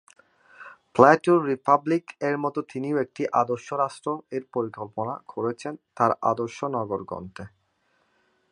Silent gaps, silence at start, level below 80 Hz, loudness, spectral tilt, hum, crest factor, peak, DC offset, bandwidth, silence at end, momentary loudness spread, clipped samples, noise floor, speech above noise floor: none; 0.6 s; -66 dBFS; -25 LUFS; -7 dB/octave; none; 24 dB; -2 dBFS; under 0.1%; 10.5 kHz; 1.05 s; 14 LU; under 0.1%; -69 dBFS; 45 dB